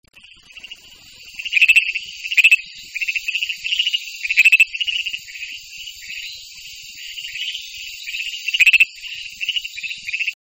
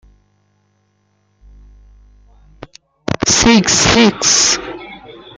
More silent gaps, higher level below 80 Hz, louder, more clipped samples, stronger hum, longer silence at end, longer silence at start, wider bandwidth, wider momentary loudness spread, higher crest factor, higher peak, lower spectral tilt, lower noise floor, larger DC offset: neither; second, -60 dBFS vs -38 dBFS; second, -16 LUFS vs -11 LUFS; neither; second, none vs 50 Hz at -45 dBFS; about the same, 0.1 s vs 0.2 s; second, 0.55 s vs 2.6 s; first, 16.5 kHz vs 10.5 kHz; about the same, 21 LU vs 22 LU; about the same, 18 dB vs 16 dB; about the same, -2 dBFS vs 0 dBFS; second, 4 dB/octave vs -2.5 dB/octave; second, -44 dBFS vs -61 dBFS; neither